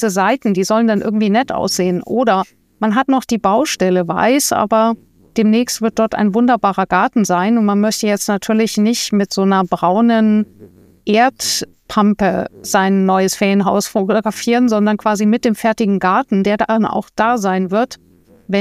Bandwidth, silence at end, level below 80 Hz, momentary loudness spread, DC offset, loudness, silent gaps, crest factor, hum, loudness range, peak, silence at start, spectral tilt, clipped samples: 15.5 kHz; 0 s; -52 dBFS; 4 LU; under 0.1%; -15 LUFS; none; 14 dB; none; 1 LU; 0 dBFS; 0 s; -5 dB/octave; under 0.1%